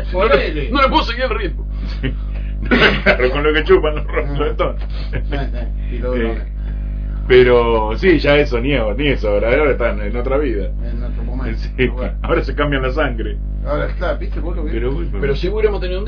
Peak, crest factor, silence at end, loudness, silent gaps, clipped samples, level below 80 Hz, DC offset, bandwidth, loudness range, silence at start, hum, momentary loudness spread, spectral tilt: 0 dBFS; 16 dB; 0 s; -17 LUFS; none; under 0.1%; -20 dBFS; under 0.1%; 5.4 kHz; 6 LU; 0 s; 50 Hz at -20 dBFS; 12 LU; -7.5 dB/octave